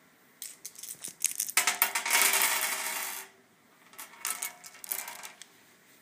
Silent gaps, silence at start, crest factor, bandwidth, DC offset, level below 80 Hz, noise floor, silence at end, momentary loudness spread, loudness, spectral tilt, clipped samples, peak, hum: none; 0.4 s; 32 dB; 16 kHz; under 0.1%; -90 dBFS; -62 dBFS; 0.65 s; 21 LU; -28 LUFS; 2.5 dB/octave; under 0.1%; -2 dBFS; none